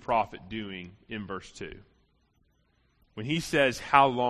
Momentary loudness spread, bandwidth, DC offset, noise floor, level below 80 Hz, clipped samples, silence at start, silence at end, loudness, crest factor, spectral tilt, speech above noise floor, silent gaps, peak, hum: 20 LU; 13 kHz; under 0.1%; -69 dBFS; -58 dBFS; under 0.1%; 0.1 s; 0 s; -28 LUFS; 26 dB; -4.5 dB/octave; 41 dB; none; -4 dBFS; none